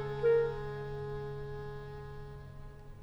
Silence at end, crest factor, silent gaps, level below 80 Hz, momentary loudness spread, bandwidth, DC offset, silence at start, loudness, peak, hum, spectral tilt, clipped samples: 0 s; 16 dB; none; -50 dBFS; 21 LU; 7 kHz; under 0.1%; 0 s; -36 LUFS; -20 dBFS; none; -8 dB/octave; under 0.1%